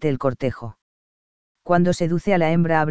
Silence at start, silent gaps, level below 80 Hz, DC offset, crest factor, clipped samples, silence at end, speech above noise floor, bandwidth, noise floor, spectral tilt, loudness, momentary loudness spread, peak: 0 s; 0.82-1.55 s; -48 dBFS; under 0.1%; 18 dB; under 0.1%; 0 s; over 70 dB; 8 kHz; under -90 dBFS; -7.5 dB/octave; -20 LUFS; 18 LU; -4 dBFS